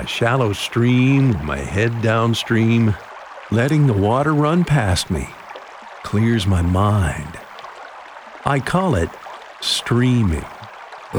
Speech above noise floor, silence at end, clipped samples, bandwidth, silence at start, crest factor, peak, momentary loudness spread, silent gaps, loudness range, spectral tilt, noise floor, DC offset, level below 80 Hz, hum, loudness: 20 dB; 0 s; under 0.1%; 19.5 kHz; 0 s; 16 dB; -2 dBFS; 20 LU; none; 4 LU; -6 dB/octave; -37 dBFS; under 0.1%; -36 dBFS; none; -18 LUFS